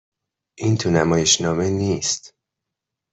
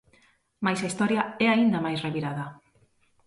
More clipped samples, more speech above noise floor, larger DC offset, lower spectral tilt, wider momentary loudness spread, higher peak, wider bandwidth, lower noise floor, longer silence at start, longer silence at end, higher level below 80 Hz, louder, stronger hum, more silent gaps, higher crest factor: neither; first, 64 dB vs 39 dB; neither; second, -4 dB/octave vs -5.5 dB/octave; second, 8 LU vs 11 LU; first, -2 dBFS vs -8 dBFS; second, 8.4 kHz vs 11.5 kHz; first, -83 dBFS vs -64 dBFS; about the same, 0.6 s vs 0.6 s; about the same, 0.85 s vs 0.75 s; first, -52 dBFS vs -66 dBFS; first, -19 LUFS vs -26 LUFS; neither; neither; about the same, 20 dB vs 18 dB